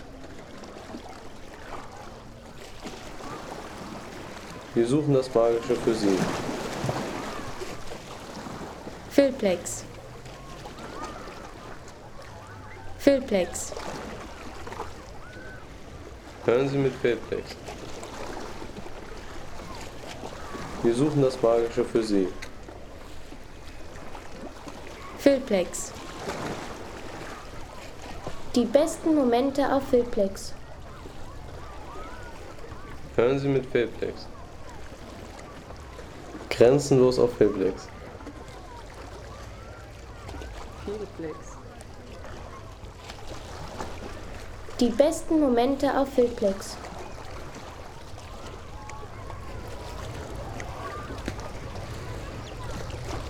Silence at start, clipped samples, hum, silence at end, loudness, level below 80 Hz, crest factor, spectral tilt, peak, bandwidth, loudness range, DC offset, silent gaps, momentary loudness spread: 0 s; under 0.1%; none; 0 s; -27 LUFS; -46 dBFS; 24 dB; -5.5 dB/octave; -6 dBFS; 19.5 kHz; 14 LU; under 0.1%; none; 20 LU